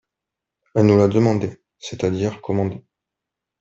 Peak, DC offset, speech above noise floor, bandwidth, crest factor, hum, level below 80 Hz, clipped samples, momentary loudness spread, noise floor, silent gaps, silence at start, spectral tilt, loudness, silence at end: -4 dBFS; under 0.1%; 66 dB; 7.8 kHz; 18 dB; none; -56 dBFS; under 0.1%; 18 LU; -85 dBFS; none; 0.75 s; -7.5 dB/octave; -20 LUFS; 0.8 s